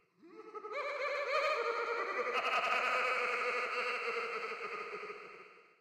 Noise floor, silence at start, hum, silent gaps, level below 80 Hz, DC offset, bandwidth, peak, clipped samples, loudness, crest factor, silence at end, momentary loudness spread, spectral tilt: -57 dBFS; 0.25 s; none; none; -82 dBFS; under 0.1%; 15 kHz; -20 dBFS; under 0.1%; -35 LUFS; 18 dB; 0.2 s; 16 LU; -1 dB/octave